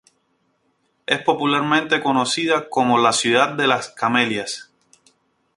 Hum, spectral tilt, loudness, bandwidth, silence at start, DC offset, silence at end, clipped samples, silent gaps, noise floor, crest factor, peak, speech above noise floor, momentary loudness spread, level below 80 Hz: none; -3.5 dB/octave; -19 LUFS; 11.5 kHz; 1.1 s; under 0.1%; 0.95 s; under 0.1%; none; -67 dBFS; 20 dB; 0 dBFS; 48 dB; 7 LU; -64 dBFS